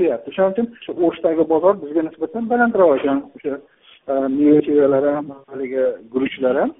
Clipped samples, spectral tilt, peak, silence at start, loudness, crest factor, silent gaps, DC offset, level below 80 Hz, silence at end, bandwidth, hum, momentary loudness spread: under 0.1%; -5.5 dB/octave; -2 dBFS; 0 s; -18 LUFS; 16 dB; none; under 0.1%; -60 dBFS; 0.1 s; 3.9 kHz; none; 13 LU